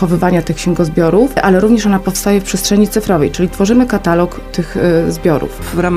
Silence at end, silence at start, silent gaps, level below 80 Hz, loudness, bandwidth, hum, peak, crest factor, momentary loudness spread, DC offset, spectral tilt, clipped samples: 0 s; 0 s; none; -28 dBFS; -13 LUFS; 16 kHz; none; 0 dBFS; 12 dB; 6 LU; under 0.1%; -6 dB/octave; under 0.1%